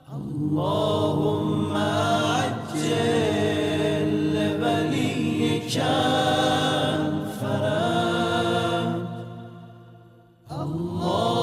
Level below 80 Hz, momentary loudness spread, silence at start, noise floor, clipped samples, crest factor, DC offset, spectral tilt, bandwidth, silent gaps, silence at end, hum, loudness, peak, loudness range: -58 dBFS; 8 LU; 0.1 s; -51 dBFS; under 0.1%; 14 dB; under 0.1%; -5.5 dB/octave; 15.5 kHz; none; 0 s; none; -24 LUFS; -10 dBFS; 4 LU